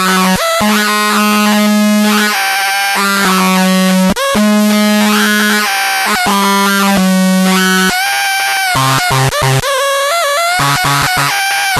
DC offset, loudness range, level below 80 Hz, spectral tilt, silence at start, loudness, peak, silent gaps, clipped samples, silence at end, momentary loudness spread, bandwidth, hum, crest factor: under 0.1%; 1 LU; -40 dBFS; -3.5 dB/octave; 0 s; -10 LUFS; -2 dBFS; none; under 0.1%; 0 s; 2 LU; 13.5 kHz; none; 10 dB